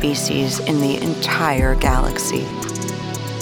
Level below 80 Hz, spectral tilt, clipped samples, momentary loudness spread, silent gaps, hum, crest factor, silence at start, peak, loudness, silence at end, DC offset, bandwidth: -26 dBFS; -4.5 dB/octave; under 0.1%; 8 LU; none; none; 16 dB; 0 s; -2 dBFS; -20 LUFS; 0 s; under 0.1%; 20 kHz